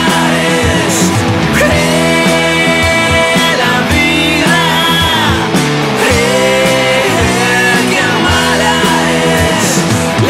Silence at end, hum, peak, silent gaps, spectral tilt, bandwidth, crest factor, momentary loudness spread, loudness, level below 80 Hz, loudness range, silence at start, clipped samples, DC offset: 0 s; none; 0 dBFS; none; -4 dB/octave; 16 kHz; 10 dB; 2 LU; -9 LUFS; -32 dBFS; 1 LU; 0 s; under 0.1%; under 0.1%